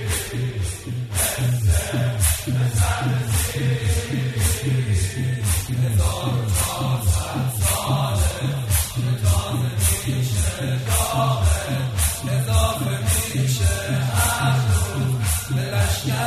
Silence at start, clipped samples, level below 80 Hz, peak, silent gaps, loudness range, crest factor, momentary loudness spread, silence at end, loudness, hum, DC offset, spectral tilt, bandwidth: 0 s; under 0.1%; -30 dBFS; -6 dBFS; none; 1 LU; 16 dB; 4 LU; 0 s; -21 LUFS; none; under 0.1%; -4.5 dB/octave; 14 kHz